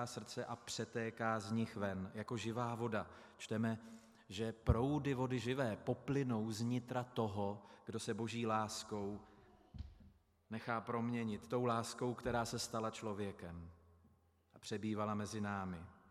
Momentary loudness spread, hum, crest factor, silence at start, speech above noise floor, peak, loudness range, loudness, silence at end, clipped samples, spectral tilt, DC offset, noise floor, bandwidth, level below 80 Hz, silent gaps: 14 LU; none; 24 dB; 0 s; 31 dB; -18 dBFS; 5 LU; -42 LUFS; 0.1 s; under 0.1%; -5.5 dB/octave; under 0.1%; -72 dBFS; 14.5 kHz; -60 dBFS; none